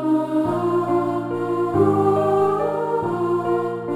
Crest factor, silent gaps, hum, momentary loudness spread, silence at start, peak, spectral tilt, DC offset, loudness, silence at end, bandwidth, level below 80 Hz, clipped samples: 14 dB; none; none; 5 LU; 0 s; -6 dBFS; -8.5 dB/octave; 0.3%; -20 LUFS; 0 s; 12.5 kHz; -56 dBFS; under 0.1%